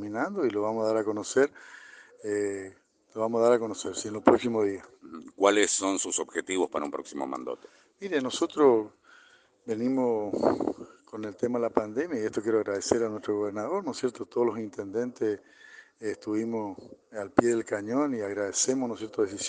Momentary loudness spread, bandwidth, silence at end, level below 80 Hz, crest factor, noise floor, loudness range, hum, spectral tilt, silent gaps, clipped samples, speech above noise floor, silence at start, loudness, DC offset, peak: 16 LU; 10 kHz; 0 s; -70 dBFS; 26 dB; -59 dBFS; 5 LU; none; -4 dB/octave; none; under 0.1%; 31 dB; 0 s; -28 LUFS; under 0.1%; -2 dBFS